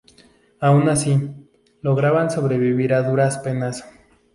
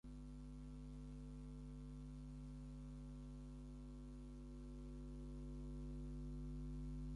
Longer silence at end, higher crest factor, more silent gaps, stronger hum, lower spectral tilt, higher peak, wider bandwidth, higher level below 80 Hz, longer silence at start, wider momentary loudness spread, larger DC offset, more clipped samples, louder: first, 0.5 s vs 0 s; first, 16 dB vs 10 dB; neither; second, none vs 50 Hz at -55 dBFS; second, -6.5 dB/octave vs -8 dB/octave; first, -4 dBFS vs -42 dBFS; about the same, 11.5 kHz vs 11 kHz; about the same, -56 dBFS vs -54 dBFS; first, 0.6 s vs 0.05 s; first, 11 LU vs 5 LU; neither; neither; first, -19 LUFS vs -54 LUFS